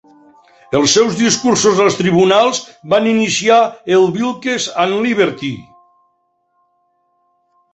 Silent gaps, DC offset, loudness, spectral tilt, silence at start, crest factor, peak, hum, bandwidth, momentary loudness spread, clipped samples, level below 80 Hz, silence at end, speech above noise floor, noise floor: none; under 0.1%; -13 LUFS; -3.5 dB/octave; 0.7 s; 14 dB; -2 dBFS; none; 8.2 kHz; 8 LU; under 0.1%; -56 dBFS; 2.1 s; 50 dB; -63 dBFS